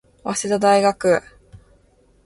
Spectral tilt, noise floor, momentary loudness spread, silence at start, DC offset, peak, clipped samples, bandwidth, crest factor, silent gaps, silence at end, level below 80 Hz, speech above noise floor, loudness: -4 dB/octave; -56 dBFS; 9 LU; 0.25 s; under 0.1%; -4 dBFS; under 0.1%; 11.5 kHz; 16 dB; none; 0.7 s; -54 dBFS; 39 dB; -18 LUFS